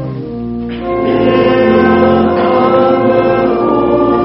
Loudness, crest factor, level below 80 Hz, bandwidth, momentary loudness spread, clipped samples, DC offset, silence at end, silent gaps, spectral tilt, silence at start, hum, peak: -11 LUFS; 10 dB; -36 dBFS; 5.8 kHz; 11 LU; under 0.1%; under 0.1%; 0 s; none; -5.5 dB/octave; 0 s; none; 0 dBFS